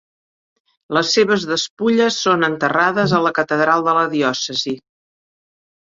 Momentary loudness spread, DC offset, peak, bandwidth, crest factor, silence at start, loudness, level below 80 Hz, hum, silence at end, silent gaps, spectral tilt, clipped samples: 6 LU; under 0.1%; -2 dBFS; 7.8 kHz; 16 dB; 0.9 s; -17 LUFS; -60 dBFS; none; 1.2 s; 1.70-1.77 s; -4 dB/octave; under 0.1%